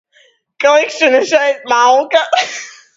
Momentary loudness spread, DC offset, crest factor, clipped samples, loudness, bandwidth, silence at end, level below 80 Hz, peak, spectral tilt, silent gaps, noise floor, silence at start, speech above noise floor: 6 LU; under 0.1%; 14 dB; under 0.1%; -12 LUFS; 7.8 kHz; 0.25 s; -64 dBFS; 0 dBFS; -0.5 dB/octave; none; -52 dBFS; 0.6 s; 40 dB